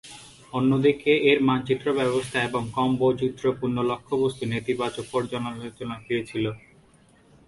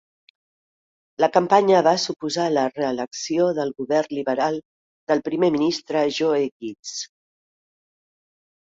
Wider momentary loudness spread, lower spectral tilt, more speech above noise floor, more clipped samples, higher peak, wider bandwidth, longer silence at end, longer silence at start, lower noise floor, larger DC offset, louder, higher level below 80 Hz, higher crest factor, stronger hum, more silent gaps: about the same, 13 LU vs 14 LU; first, -6 dB/octave vs -4.5 dB/octave; second, 32 dB vs over 69 dB; neither; second, -6 dBFS vs -2 dBFS; first, 11.5 kHz vs 8 kHz; second, 0.9 s vs 1.65 s; second, 0.05 s vs 1.2 s; second, -57 dBFS vs under -90 dBFS; neither; second, -25 LUFS vs -21 LUFS; first, -58 dBFS vs -68 dBFS; about the same, 18 dB vs 20 dB; neither; second, none vs 4.65-5.07 s, 6.52-6.60 s, 6.79-6.83 s